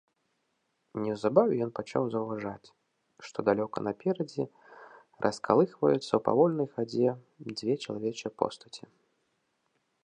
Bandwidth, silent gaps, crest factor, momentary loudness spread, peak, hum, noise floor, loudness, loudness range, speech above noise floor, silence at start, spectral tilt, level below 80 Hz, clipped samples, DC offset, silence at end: 10 kHz; none; 24 dB; 15 LU; -8 dBFS; none; -78 dBFS; -30 LUFS; 5 LU; 48 dB; 0.95 s; -6.5 dB/octave; -72 dBFS; under 0.1%; under 0.1%; 1.25 s